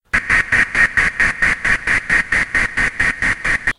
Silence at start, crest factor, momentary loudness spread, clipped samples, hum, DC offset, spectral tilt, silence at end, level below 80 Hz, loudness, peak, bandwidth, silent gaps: 0.15 s; 16 dB; 3 LU; under 0.1%; none; under 0.1%; -3 dB/octave; 0.05 s; -32 dBFS; -15 LUFS; -2 dBFS; 11.5 kHz; none